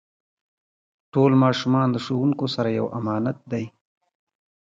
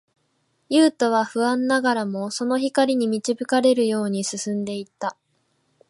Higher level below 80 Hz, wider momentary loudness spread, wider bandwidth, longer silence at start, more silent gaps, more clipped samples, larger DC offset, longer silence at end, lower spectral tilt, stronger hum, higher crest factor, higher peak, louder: first, -64 dBFS vs -74 dBFS; about the same, 12 LU vs 10 LU; second, 7.6 kHz vs 11.5 kHz; first, 1.15 s vs 0.7 s; neither; neither; neither; first, 1 s vs 0.75 s; first, -7.5 dB/octave vs -4 dB/octave; neither; about the same, 18 dB vs 16 dB; about the same, -6 dBFS vs -6 dBFS; about the same, -22 LUFS vs -22 LUFS